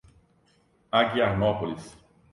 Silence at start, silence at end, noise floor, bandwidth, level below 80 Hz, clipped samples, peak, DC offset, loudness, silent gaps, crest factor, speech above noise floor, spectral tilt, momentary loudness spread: 0.95 s; 0.4 s; -65 dBFS; 11.5 kHz; -52 dBFS; under 0.1%; -8 dBFS; under 0.1%; -25 LUFS; none; 20 dB; 40 dB; -6.5 dB/octave; 11 LU